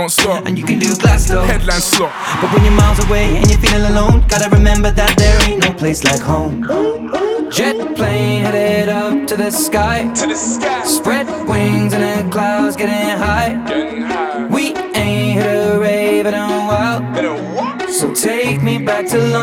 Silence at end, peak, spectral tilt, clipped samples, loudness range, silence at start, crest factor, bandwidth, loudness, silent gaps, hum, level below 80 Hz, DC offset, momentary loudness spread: 0 s; 0 dBFS; -4.5 dB/octave; under 0.1%; 4 LU; 0 s; 14 dB; 18.5 kHz; -14 LUFS; none; none; -20 dBFS; under 0.1%; 6 LU